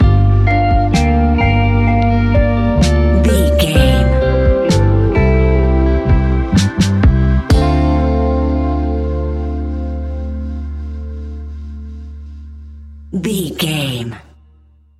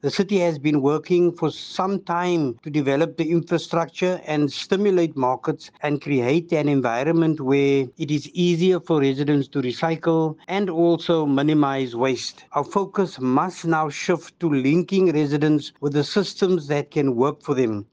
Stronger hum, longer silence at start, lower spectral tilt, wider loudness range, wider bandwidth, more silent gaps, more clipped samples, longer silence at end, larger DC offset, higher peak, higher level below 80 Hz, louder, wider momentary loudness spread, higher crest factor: neither; about the same, 0 s vs 0.05 s; about the same, -7 dB/octave vs -6.5 dB/octave; first, 12 LU vs 2 LU; first, 14 kHz vs 9.2 kHz; neither; neither; first, 0.8 s vs 0.1 s; neither; first, 0 dBFS vs -4 dBFS; first, -18 dBFS vs -66 dBFS; first, -14 LUFS vs -22 LUFS; first, 16 LU vs 5 LU; about the same, 14 dB vs 16 dB